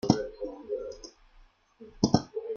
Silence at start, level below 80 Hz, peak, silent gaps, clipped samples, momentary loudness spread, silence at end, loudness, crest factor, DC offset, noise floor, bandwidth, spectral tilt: 0.05 s; -56 dBFS; -6 dBFS; none; under 0.1%; 18 LU; 0 s; -31 LUFS; 26 dB; under 0.1%; -59 dBFS; 7.4 kHz; -6 dB/octave